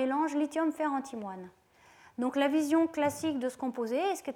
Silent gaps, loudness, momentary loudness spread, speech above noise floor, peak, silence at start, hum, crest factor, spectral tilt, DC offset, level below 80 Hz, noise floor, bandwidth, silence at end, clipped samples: none; -31 LUFS; 14 LU; 29 dB; -14 dBFS; 0 s; none; 18 dB; -4.5 dB/octave; under 0.1%; -76 dBFS; -59 dBFS; 16.5 kHz; 0 s; under 0.1%